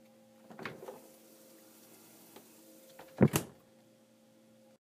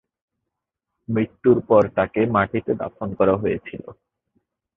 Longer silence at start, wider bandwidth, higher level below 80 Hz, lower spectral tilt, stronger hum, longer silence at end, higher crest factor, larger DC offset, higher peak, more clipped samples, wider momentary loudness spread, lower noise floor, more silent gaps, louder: second, 0.5 s vs 1.1 s; first, 15.5 kHz vs 4 kHz; second, -68 dBFS vs -50 dBFS; second, -6 dB/octave vs -10 dB/octave; neither; first, 1.45 s vs 0.85 s; first, 28 dB vs 20 dB; neither; second, -12 dBFS vs -2 dBFS; neither; first, 28 LU vs 13 LU; second, -64 dBFS vs -82 dBFS; neither; second, -33 LUFS vs -21 LUFS